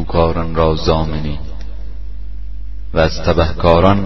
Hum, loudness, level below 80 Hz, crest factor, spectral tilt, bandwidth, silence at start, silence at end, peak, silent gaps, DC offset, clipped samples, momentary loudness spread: none; -15 LUFS; -24 dBFS; 16 dB; -7 dB/octave; 6.2 kHz; 0 s; 0 s; 0 dBFS; none; 8%; under 0.1%; 19 LU